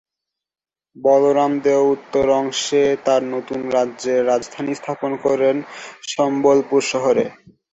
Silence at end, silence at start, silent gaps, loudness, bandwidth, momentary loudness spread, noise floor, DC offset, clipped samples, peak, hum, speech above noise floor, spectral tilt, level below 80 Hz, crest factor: 0.4 s; 0.95 s; none; -18 LUFS; 8.2 kHz; 10 LU; under -90 dBFS; under 0.1%; under 0.1%; -2 dBFS; none; over 72 dB; -4.5 dB/octave; -58 dBFS; 16 dB